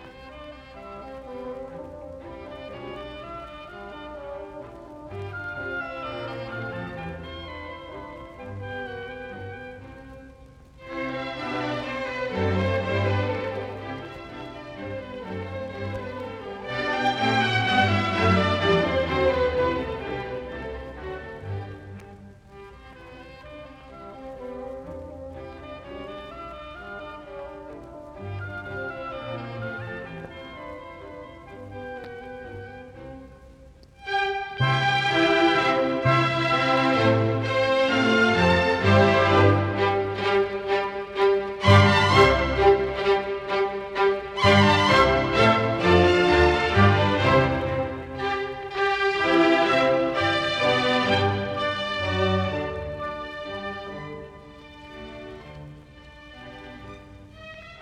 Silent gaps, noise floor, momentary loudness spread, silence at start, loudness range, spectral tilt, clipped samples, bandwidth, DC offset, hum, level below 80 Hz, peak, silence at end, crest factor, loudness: none; -49 dBFS; 22 LU; 0 s; 19 LU; -6 dB/octave; under 0.1%; 10.5 kHz; under 0.1%; none; -46 dBFS; -4 dBFS; 0 s; 22 dB; -22 LUFS